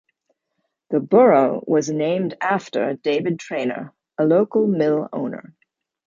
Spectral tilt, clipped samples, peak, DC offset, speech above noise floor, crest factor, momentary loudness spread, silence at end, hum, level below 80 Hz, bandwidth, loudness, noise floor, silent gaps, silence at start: -6.5 dB/octave; under 0.1%; -2 dBFS; under 0.1%; 56 dB; 18 dB; 13 LU; 0.7 s; none; -70 dBFS; 7.6 kHz; -20 LUFS; -75 dBFS; none; 0.9 s